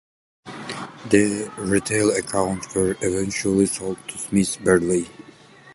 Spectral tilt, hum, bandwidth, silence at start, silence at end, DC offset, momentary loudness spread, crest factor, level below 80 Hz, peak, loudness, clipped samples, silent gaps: -4.5 dB/octave; none; 12 kHz; 0.45 s; 0 s; under 0.1%; 14 LU; 22 dB; -48 dBFS; -2 dBFS; -22 LUFS; under 0.1%; none